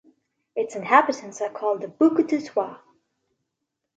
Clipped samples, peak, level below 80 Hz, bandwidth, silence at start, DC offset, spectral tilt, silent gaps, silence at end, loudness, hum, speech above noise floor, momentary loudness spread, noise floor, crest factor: under 0.1%; -2 dBFS; -76 dBFS; 8 kHz; 0.55 s; under 0.1%; -5 dB/octave; none; 1.2 s; -23 LUFS; none; 59 dB; 12 LU; -81 dBFS; 22 dB